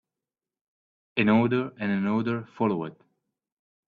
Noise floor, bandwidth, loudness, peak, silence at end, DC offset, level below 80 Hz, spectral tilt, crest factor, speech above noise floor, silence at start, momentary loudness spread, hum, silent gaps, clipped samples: under -90 dBFS; 4.7 kHz; -26 LUFS; -10 dBFS; 0.95 s; under 0.1%; -68 dBFS; -9 dB/octave; 20 dB; over 65 dB; 1.15 s; 10 LU; none; none; under 0.1%